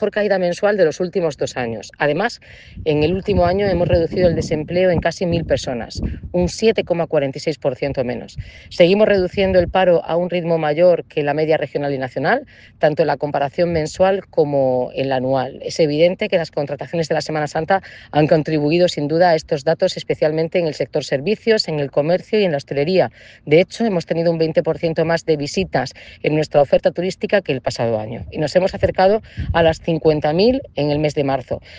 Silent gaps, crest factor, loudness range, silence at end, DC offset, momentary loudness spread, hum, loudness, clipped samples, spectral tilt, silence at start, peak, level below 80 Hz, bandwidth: none; 18 dB; 2 LU; 0 s; under 0.1%; 8 LU; none; -18 LUFS; under 0.1%; -6 dB/octave; 0 s; 0 dBFS; -40 dBFS; 9.6 kHz